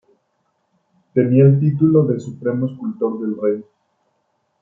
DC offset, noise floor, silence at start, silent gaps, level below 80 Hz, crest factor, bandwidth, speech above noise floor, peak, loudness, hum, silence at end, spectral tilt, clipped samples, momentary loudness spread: under 0.1%; -68 dBFS; 1.15 s; none; -62 dBFS; 16 dB; 7.2 kHz; 52 dB; -2 dBFS; -18 LUFS; none; 1 s; -11.5 dB/octave; under 0.1%; 11 LU